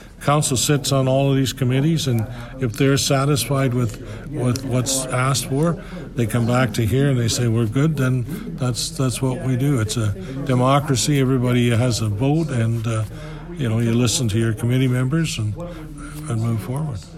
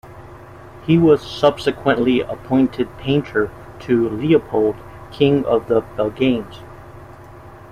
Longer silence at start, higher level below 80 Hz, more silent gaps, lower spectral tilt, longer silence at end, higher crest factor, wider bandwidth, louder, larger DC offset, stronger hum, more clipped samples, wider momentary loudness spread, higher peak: about the same, 0 s vs 0.05 s; first, -40 dBFS vs -46 dBFS; neither; second, -5.5 dB/octave vs -7.5 dB/octave; second, 0 s vs 0.15 s; about the same, 16 dB vs 16 dB; first, 15 kHz vs 13.5 kHz; about the same, -20 LUFS vs -18 LUFS; neither; neither; neither; second, 9 LU vs 19 LU; about the same, -4 dBFS vs -2 dBFS